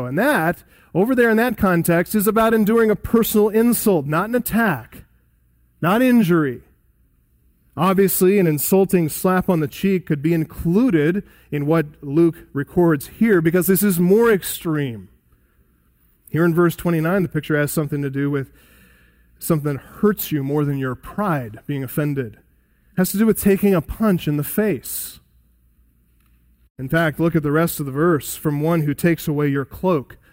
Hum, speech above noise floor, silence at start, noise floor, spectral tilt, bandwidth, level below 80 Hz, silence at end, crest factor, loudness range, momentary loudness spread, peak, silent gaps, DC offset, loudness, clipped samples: none; 41 dB; 0 s; -59 dBFS; -6.5 dB/octave; 16.5 kHz; -46 dBFS; 0.15 s; 16 dB; 6 LU; 10 LU; -4 dBFS; 26.70-26.75 s; under 0.1%; -19 LUFS; under 0.1%